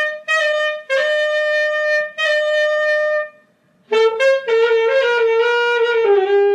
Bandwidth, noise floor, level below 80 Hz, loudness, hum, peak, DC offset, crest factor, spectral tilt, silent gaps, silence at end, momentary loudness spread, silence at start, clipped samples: 10 kHz; -56 dBFS; -80 dBFS; -16 LUFS; none; -4 dBFS; under 0.1%; 12 dB; -1 dB/octave; none; 0 s; 4 LU; 0 s; under 0.1%